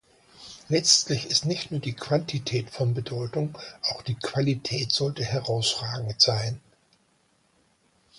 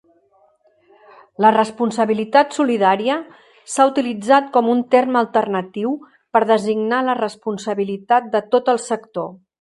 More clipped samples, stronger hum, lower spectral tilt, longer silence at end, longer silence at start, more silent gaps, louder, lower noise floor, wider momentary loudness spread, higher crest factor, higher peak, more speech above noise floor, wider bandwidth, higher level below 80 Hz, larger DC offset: neither; neither; second, -3.5 dB/octave vs -5 dB/octave; first, 1.6 s vs 0.25 s; second, 0.35 s vs 1.4 s; neither; second, -25 LUFS vs -18 LUFS; first, -66 dBFS vs -57 dBFS; about the same, 11 LU vs 9 LU; first, 24 dB vs 18 dB; second, -4 dBFS vs 0 dBFS; about the same, 40 dB vs 40 dB; about the same, 11.5 kHz vs 11.5 kHz; first, -60 dBFS vs -70 dBFS; neither